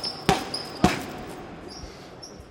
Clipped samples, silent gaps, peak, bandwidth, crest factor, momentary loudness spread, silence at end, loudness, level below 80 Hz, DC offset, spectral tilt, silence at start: under 0.1%; none; 0 dBFS; 17 kHz; 30 dB; 17 LU; 0 s; -27 LUFS; -44 dBFS; under 0.1%; -4.5 dB/octave; 0 s